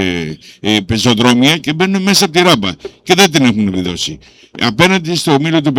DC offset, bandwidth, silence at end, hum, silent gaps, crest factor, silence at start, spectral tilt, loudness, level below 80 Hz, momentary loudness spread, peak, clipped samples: under 0.1%; 19 kHz; 0 s; none; none; 12 dB; 0 s; -4 dB/octave; -12 LUFS; -44 dBFS; 11 LU; 0 dBFS; under 0.1%